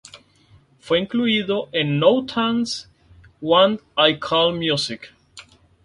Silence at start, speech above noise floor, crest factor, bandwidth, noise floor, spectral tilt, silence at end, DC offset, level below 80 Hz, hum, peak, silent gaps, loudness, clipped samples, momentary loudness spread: 0.15 s; 35 dB; 20 dB; 11.5 kHz; -54 dBFS; -5 dB/octave; 0.45 s; under 0.1%; -58 dBFS; none; -2 dBFS; none; -19 LUFS; under 0.1%; 11 LU